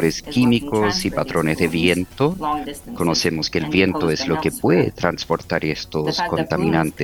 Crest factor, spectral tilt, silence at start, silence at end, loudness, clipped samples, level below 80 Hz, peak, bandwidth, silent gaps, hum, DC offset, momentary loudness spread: 18 dB; -5 dB/octave; 0 s; 0 s; -20 LUFS; under 0.1%; -42 dBFS; 0 dBFS; 20 kHz; none; none; under 0.1%; 6 LU